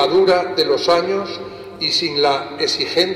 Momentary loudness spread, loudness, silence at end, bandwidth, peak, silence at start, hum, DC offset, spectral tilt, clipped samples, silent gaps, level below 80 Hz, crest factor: 10 LU; -17 LUFS; 0 s; 13.5 kHz; -2 dBFS; 0 s; none; under 0.1%; -3.5 dB/octave; under 0.1%; none; -56 dBFS; 14 dB